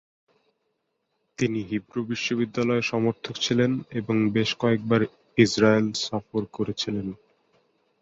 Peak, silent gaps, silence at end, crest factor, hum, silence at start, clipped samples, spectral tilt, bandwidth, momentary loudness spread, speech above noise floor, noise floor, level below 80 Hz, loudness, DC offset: -4 dBFS; none; 0.85 s; 20 dB; none; 1.4 s; under 0.1%; -5.5 dB/octave; 8 kHz; 10 LU; 52 dB; -76 dBFS; -60 dBFS; -25 LUFS; under 0.1%